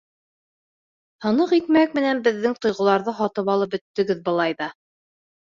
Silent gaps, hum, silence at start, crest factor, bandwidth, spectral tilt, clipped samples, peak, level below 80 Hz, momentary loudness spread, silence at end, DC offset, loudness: 3.81-3.94 s; none; 1.2 s; 18 dB; 7.4 kHz; -6 dB/octave; under 0.1%; -4 dBFS; -66 dBFS; 7 LU; 0.7 s; under 0.1%; -21 LUFS